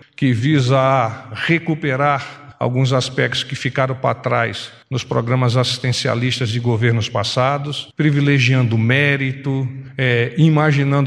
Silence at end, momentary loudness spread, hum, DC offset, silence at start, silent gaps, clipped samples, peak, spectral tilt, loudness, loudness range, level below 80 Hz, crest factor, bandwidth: 0 s; 8 LU; none; under 0.1%; 0.2 s; none; under 0.1%; 0 dBFS; -6 dB/octave; -17 LUFS; 3 LU; -54 dBFS; 16 dB; 10.5 kHz